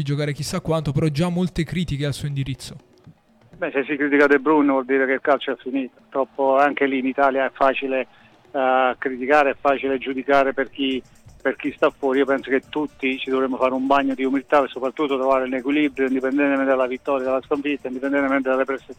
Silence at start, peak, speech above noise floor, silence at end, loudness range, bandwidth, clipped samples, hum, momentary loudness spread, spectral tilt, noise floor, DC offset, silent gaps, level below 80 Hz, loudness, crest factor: 0 s; -6 dBFS; 30 dB; 0.05 s; 3 LU; 13 kHz; under 0.1%; none; 9 LU; -6.5 dB/octave; -51 dBFS; under 0.1%; none; -50 dBFS; -21 LUFS; 16 dB